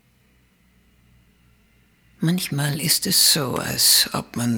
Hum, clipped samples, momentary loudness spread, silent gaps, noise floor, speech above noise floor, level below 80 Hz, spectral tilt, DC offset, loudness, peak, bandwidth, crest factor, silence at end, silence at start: none; under 0.1%; 10 LU; none; -59 dBFS; 39 dB; -56 dBFS; -2.5 dB/octave; under 0.1%; -18 LUFS; -2 dBFS; over 20 kHz; 20 dB; 0 s; 2.2 s